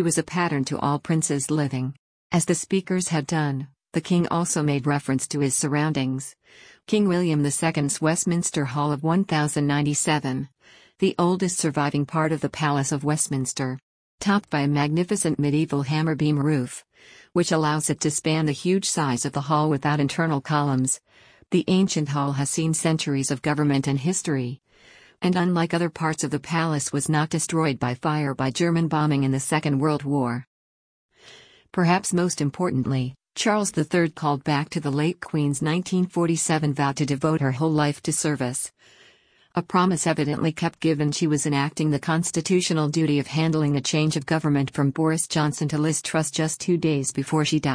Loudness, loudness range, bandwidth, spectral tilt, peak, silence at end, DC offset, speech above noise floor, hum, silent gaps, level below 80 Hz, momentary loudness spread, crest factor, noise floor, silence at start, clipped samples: -23 LUFS; 2 LU; 10.5 kHz; -5 dB/octave; -8 dBFS; 0 s; under 0.1%; 35 dB; none; 1.99-2.30 s, 13.83-14.18 s, 30.47-31.09 s; -60 dBFS; 4 LU; 16 dB; -58 dBFS; 0 s; under 0.1%